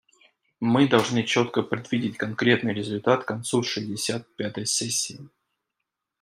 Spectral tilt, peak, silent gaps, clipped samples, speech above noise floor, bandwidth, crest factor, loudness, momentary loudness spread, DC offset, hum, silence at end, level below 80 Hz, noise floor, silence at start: -4 dB/octave; -4 dBFS; none; under 0.1%; 59 dB; 15.5 kHz; 22 dB; -25 LUFS; 9 LU; under 0.1%; none; 0.95 s; -68 dBFS; -83 dBFS; 0.6 s